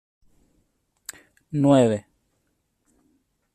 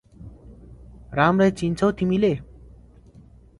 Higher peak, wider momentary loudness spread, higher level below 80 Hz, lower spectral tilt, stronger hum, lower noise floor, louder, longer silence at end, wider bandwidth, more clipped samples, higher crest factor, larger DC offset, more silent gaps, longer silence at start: about the same, -6 dBFS vs -4 dBFS; first, 23 LU vs 13 LU; second, -64 dBFS vs -46 dBFS; about the same, -7 dB/octave vs -7.5 dB/octave; neither; first, -72 dBFS vs -49 dBFS; about the same, -21 LUFS vs -21 LUFS; first, 1.55 s vs 1.15 s; first, 14 kHz vs 11.5 kHz; neither; about the same, 22 dB vs 20 dB; neither; neither; first, 1.55 s vs 0.2 s